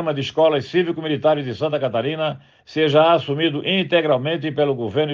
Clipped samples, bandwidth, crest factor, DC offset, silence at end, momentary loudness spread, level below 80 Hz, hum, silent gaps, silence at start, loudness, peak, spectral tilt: under 0.1%; 7.2 kHz; 16 dB; under 0.1%; 0 s; 7 LU; -64 dBFS; none; none; 0 s; -19 LUFS; -2 dBFS; -7 dB/octave